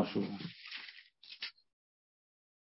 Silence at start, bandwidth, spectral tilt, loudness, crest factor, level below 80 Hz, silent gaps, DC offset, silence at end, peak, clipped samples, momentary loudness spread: 0 s; 5.8 kHz; -4 dB/octave; -43 LUFS; 24 dB; -80 dBFS; none; under 0.1%; 1.25 s; -20 dBFS; under 0.1%; 15 LU